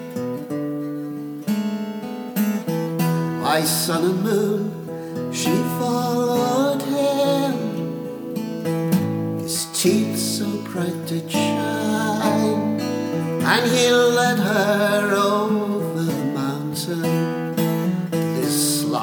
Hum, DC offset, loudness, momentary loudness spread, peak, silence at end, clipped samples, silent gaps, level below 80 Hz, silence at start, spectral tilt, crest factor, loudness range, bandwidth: none; under 0.1%; -21 LUFS; 9 LU; -2 dBFS; 0 s; under 0.1%; none; -66 dBFS; 0 s; -4.5 dB/octave; 20 dB; 4 LU; over 20 kHz